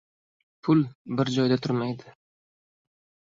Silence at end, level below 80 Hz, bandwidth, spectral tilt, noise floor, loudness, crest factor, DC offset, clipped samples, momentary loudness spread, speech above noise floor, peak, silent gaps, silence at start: 1.15 s; -66 dBFS; 7.6 kHz; -7 dB/octave; under -90 dBFS; -26 LUFS; 18 dB; under 0.1%; under 0.1%; 10 LU; over 65 dB; -10 dBFS; 0.95-1.05 s; 0.65 s